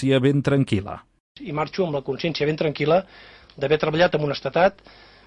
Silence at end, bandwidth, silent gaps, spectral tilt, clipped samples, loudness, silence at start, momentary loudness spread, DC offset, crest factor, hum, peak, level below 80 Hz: 0.55 s; 10.5 kHz; 1.20-1.35 s; -7 dB/octave; under 0.1%; -22 LUFS; 0 s; 12 LU; under 0.1%; 16 dB; none; -6 dBFS; -52 dBFS